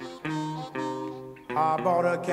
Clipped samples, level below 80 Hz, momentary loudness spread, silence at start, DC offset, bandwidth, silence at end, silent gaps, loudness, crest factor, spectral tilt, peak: under 0.1%; -66 dBFS; 11 LU; 0 s; under 0.1%; 15 kHz; 0 s; none; -29 LUFS; 16 dB; -6.5 dB/octave; -12 dBFS